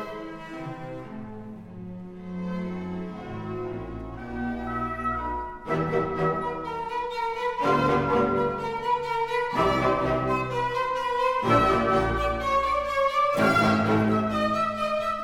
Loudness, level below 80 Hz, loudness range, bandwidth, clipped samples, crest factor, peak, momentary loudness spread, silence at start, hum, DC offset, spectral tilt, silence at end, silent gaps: -26 LUFS; -44 dBFS; 12 LU; 17 kHz; under 0.1%; 18 dB; -8 dBFS; 16 LU; 0 s; none; under 0.1%; -6.5 dB/octave; 0 s; none